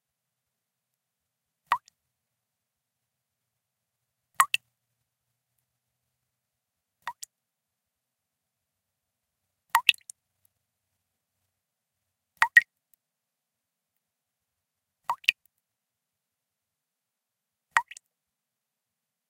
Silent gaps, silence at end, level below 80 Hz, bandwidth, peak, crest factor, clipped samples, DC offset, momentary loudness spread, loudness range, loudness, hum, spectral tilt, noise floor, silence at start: none; 1.5 s; -90 dBFS; 16 kHz; 0 dBFS; 34 dB; under 0.1%; under 0.1%; 23 LU; 21 LU; -25 LUFS; none; 3.5 dB/octave; -86 dBFS; 1.7 s